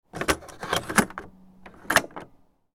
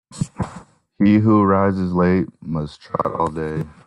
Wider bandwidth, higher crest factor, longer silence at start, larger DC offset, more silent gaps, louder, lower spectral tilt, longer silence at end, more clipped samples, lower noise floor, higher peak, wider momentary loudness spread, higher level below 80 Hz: first, 18 kHz vs 11 kHz; first, 28 dB vs 16 dB; about the same, 0.15 s vs 0.1 s; neither; neither; second, -25 LUFS vs -19 LUFS; second, -3 dB/octave vs -8.5 dB/octave; first, 0.5 s vs 0.15 s; neither; first, -57 dBFS vs -42 dBFS; first, 0 dBFS vs -4 dBFS; first, 18 LU vs 12 LU; about the same, -50 dBFS vs -48 dBFS